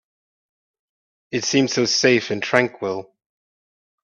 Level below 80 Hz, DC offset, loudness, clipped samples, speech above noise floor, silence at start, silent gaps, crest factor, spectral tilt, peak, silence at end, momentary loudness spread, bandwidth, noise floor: -64 dBFS; under 0.1%; -19 LUFS; under 0.1%; over 70 dB; 1.3 s; none; 22 dB; -3.5 dB/octave; 0 dBFS; 1 s; 11 LU; 8.4 kHz; under -90 dBFS